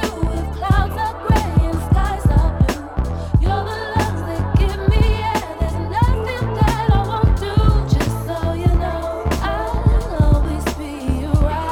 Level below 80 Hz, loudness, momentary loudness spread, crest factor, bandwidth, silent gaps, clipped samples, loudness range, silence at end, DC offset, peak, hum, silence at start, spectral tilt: -20 dBFS; -19 LUFS; 6 LU; 16 dB; 15.5 kHz; none; under 0.1%; 1 LU; 0 s; under 0.1%; -2 dBFS; none; 0 s; -7 dB/octave